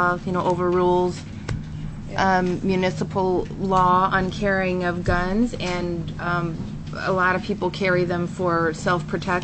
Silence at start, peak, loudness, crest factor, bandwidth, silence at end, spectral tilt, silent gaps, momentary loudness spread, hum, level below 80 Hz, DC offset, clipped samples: 0 s; -6 dBFS; -22 LUFS; 16 dB; 8.6 kHz; 0 s; -6.5 dB/octave; none; 11 LU; none; -38 dBFS; under 0.1%; under 0.1%